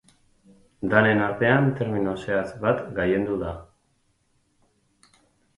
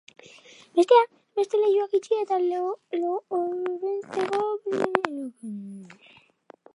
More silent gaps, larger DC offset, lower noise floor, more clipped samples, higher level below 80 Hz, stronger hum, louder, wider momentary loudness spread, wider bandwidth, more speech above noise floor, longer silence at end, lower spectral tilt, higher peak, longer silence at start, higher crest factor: neither; neither; first, -68 dBFS vs -55 dBFS; neither; first, -52 dBFS vs -80 dBFS; neither; about the same, -23 LUFS vs -25 LUFS; second, 10 LU vs 17 LU; about the same, 11 kHz vs 11 kHz; first, 45 dB vs 30 dB; first, 1.95 s vs 0.8 s; first, -8 dB/octave vs -5 dB/octave; about the same, -2 dBFS vs -2 dBFS; about the same, 0.8 s vs 0.75 s; about the same, 24 dB vs 24 dB